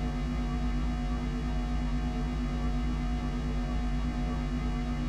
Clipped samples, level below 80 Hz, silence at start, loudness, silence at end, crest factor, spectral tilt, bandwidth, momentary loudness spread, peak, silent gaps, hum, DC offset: under 0.1%; -32 dBFS; 0 s; -33 LUFS; 0 s; 10 dB; -7 dB/octave; 8.8 kHz; 1 LU; -20 dBFS; none; none; under 0.1%